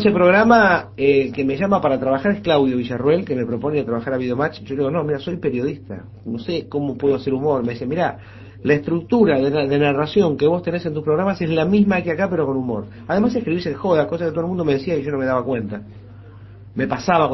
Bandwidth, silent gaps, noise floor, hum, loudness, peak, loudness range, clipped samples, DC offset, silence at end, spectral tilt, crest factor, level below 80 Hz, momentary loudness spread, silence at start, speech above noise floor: 6 kHz; none; -40 dBFS; none; -19 LUFS; 0 dBFS; 5 LU; under 0.1%; under 0.1%; 0 s; -8 dB/octave; 18 dB; -48 dBFS; 9 LU; 0 s; 21 dB